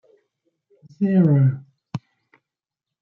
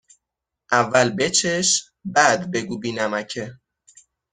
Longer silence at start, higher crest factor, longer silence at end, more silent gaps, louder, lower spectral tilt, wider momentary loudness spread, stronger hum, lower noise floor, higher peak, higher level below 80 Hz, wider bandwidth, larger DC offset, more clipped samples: first, 1 s vs 0.7 s; about the same, 16 dB vs 20 dB; first, 1.05 s vs 0.8 s; neither; about the same, -19 LUFS vs -20 LUFS; first, -11 dB/octave vs -2.5 dB/octave; first, 19 LU vs 11 LU; neither; about the same, -87 dBFS vs -84 dBFS; second, -8 dBFS vs -2 dBFS; second, -68 dBFS vs -62 dBFS; second, 4.3 kHz vs 10 kHz; neither; neither